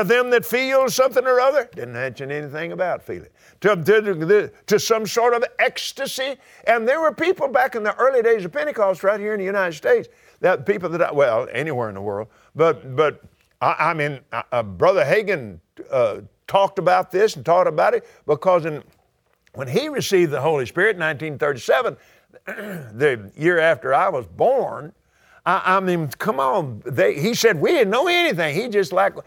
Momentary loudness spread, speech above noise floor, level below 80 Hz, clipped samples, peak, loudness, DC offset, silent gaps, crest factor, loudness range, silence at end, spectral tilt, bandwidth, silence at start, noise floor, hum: 11 LU; 44 dB; -62 dBFS; under 0.1%; -2 dBFS; -20 LUFS; under 0.1%; none; 18 dB; 2 LU; 0.05 s; -4.5 dB/octave; over 20 kHz; 0 s; -64 dBFS; none